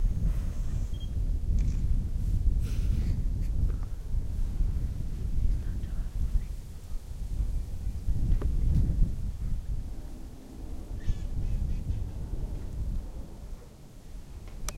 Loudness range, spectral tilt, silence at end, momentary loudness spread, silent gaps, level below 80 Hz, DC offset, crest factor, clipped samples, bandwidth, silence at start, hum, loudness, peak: 5 LU; -7 dB/octave; 0 s; 15 LU; none; -30 dBFS; under 0.1%; 18 dB; under 0.1%; 13 kHz; 0 s; none; -34 LUFS; -12 dBFS